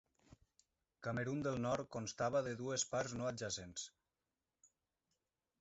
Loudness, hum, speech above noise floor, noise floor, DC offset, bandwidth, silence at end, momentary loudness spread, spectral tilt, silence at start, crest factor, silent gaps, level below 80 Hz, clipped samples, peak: -42 LUFS; none; over 49 dB; under -90 dBFS; under 0.1%; 8 kHz; 1.7 s; 10 LU; -4.5 dB/octave; 0.3 s; 18 dB; none; -70 dBFS; under 0.1%; -26 dBFS